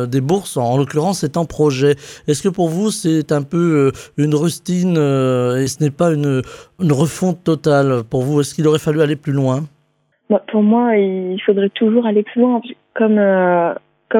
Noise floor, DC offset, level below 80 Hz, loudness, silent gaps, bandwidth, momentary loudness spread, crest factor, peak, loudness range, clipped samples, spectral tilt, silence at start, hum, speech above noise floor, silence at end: -62 dBFS; under 0.1%; -52 dBFS; -16 LUFS; none; 16.5 kHz; 5 LU; 14 dB; -2 dBFS; 2 LU; under 0.1%; -6.5 dB/octave; 0 s; none; 47 dB; 0 s